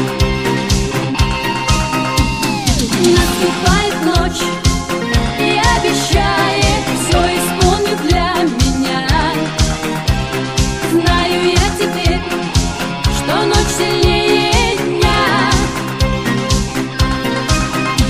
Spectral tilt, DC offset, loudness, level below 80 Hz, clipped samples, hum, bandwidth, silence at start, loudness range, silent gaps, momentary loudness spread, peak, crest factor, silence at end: -4.5 dB/octave; under 0.1%; -14 LUFS; -22 dBFS; under 0.1%; none; 15.5 kHz; 0 s; 2 LU; none; 5 LU; 0 dBFS; 14 dB; 0 s